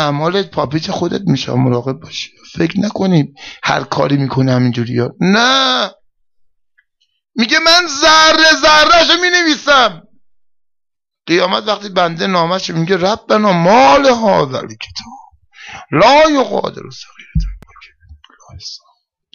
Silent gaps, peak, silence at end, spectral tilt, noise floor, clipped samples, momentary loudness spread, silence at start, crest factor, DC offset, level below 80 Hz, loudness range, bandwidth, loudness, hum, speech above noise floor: none; -2 dBFS; 0.55 s; -4 dB/octave; -74 dBFS; under 0.1%; 18 LU; 0 s; 12 dB; under 0.1%; -36 dBFS; 7 LU; 15 kHz; -11 LUFS; none; 62 dB